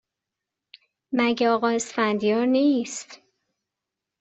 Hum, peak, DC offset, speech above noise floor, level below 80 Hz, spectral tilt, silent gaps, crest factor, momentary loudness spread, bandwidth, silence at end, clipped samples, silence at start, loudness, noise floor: none; -8 dBFS; under 0.1%; 64 dB; -70 dBFS; -4 dB/octave; none; 18 dB; 12 LU; 8.2 kHz; 1.05 s; under 0.1%; 1.1 s; -23 LUFS; -86 dBFS